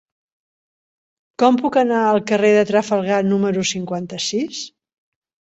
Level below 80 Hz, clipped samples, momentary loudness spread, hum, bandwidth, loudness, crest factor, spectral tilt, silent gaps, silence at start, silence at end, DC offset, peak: -62 dBFS; under 0.1%; 11 LU; none; 8.2 kHz; -18 LUFS; 18 dB; -4.5 dB/octave; none; 1.4 s; 0.9 s; under 0.1%; -2 dBFS